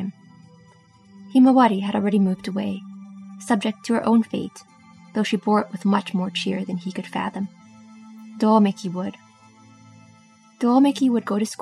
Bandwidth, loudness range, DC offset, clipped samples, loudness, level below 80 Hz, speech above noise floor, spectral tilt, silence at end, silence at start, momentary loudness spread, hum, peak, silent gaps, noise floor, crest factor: 12 kHz; 4 LU; under 0.1%; under 0.1%; -21 LUFS; -70 dBFS; 32 dB; -6.5 dB/octave; 0.05 s; 0 s; 16 LU; none; -4 dBFS; none; -52 dBFS; 18 dB